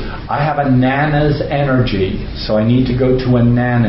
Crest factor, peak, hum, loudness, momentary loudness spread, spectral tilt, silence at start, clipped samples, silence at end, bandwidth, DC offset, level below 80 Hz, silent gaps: 12 dB; -2 dBFS; none; -14 LUFS; 6 LU; -12 dB/octave; 0 s; under 0.1%; 0 s; 5.8 kHz; under 0.1%; -28 dBFS; none